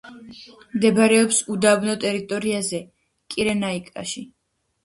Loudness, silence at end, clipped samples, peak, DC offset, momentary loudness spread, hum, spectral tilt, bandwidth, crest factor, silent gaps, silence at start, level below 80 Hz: -21 LUFS; 0.55 s; under 0.1%; -2 dBFS; under 0.1%; 16 LU; none; -3.5 dB/octave; 11.5 kHz; 20 dB; none; 0.05 s; -60 dBFS